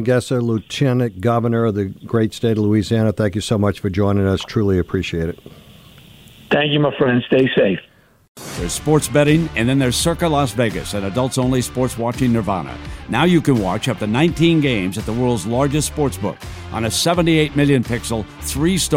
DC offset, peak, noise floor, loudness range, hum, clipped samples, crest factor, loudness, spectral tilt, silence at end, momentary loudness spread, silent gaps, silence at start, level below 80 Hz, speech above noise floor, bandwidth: under 0.1%; -2 dBFS; -43 dBFS; 2 LU; none; under 0.1%; 14 dB; -18 LUFS; -5.5 dB/octave; 0 s; 9 LU; 8.28-8.35 s; 0 s; -38 dBFS; 26 dB; 16.5 kHz